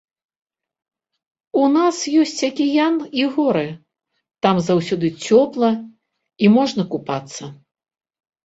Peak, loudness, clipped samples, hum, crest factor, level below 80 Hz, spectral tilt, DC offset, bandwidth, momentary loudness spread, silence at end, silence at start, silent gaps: -2 dBFS; -18 LUFS; under 0.1%; none; 18 dB; -62 dBFS; -5.5 dB/octave; under 0.1%; 8.2 kHz; 11 LU; 0.9 s; 1.55 s; none